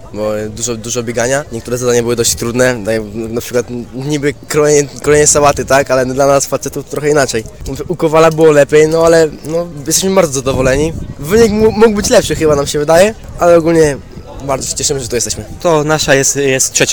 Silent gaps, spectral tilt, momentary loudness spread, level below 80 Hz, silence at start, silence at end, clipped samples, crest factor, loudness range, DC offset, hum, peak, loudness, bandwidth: none; -4 dB/octave; 11 LU; -32 dBFS; 0 s; 0 s; 0.1%; 12 dB; 4 LU; 1%; none; 0 dBFS; -11 LUFS; 19.5 kHz